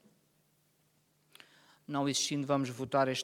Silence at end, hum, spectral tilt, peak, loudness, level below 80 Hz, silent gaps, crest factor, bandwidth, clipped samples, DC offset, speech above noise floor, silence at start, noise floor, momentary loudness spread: 0 s; none; -4 dB/octave; -16 dBFS; -33 LUFS; -76 dBFS; none; 20 dB; 16.5 kHz; under 0.1%; under 0.1%; 40 dB; 1.9 s; -73 dBFS; 4 LU